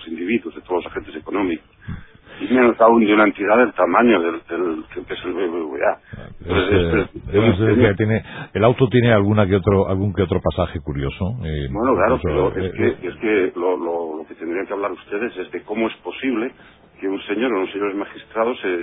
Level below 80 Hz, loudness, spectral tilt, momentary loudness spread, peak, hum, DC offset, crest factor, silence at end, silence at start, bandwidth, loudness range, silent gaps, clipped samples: -38 dBFS; -19 LUFS; -12 dB/octave; 14 LU; 0 dBFS; none; under 0.1%; 18 dB; 0 s; 0 s; 4 kHz; 8 LU; none; under 0.1%